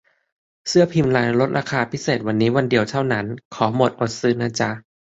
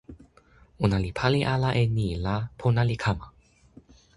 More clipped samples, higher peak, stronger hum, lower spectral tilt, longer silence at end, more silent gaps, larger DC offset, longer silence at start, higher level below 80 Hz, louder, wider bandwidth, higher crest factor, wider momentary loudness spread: neither; first, -2 dBFS vs -6 dBFS; neither; second, -5.5 dB/octave vs -7 dB/octave; second, 0.35 s vs 0.9 s; first, 3.45-3.51 s vs none; neither; first, 0.65 s vs 0.1 s; second, -54 dBFS vs -44 dBFS; first, -20 LUFS vs -26 LUFS; second, 8 kHz vs 11.5 kHz; about the same, 18 dB vs 22 dB; about the same, 7 LU vs 5 LU